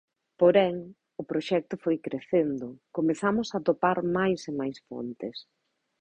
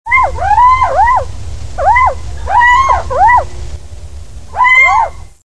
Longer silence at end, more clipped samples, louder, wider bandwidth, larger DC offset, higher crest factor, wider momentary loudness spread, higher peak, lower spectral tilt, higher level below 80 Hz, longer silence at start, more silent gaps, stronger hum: first, 0.6 s vs 0.05 s; neither; second, -27 LUFS vs -9 LUFS; second, 8.8 kHz vs 11 kHz; second, under 0.1% vs 7%; first, 20 dB vs 12 dB; second, 15 LU vs 19 LU; second, -8 dBFS vs 0 dBFS; first, -6.5 dB/octave vs -3.5 dB/octave; second, -66 dBFS vs -26 dBFS; first, 0.4 s vs 0.05 s; neither; neither